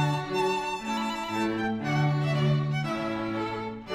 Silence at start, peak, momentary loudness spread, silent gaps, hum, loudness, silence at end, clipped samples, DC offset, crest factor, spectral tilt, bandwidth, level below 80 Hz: 0 s; -14 dBFS; 5 LU; none; none; -28 LUFS; 0 s; under 0.1%; under 0.1%; 14 dB; -6.5 dB/octave; 12.5 kHz; -56 dBFS